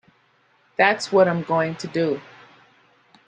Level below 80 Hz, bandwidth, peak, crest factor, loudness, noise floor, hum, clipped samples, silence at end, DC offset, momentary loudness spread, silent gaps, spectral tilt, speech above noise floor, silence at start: -68 dBFS; 9.6 kHz; -2 dBFS; 20 dB; -21 LUFS; -61 dBFS; none; under 0.1%; 1.1 s; under 0.1%; 9 LU; none; -5.5 dB/octave; 41 dB; 0.8 s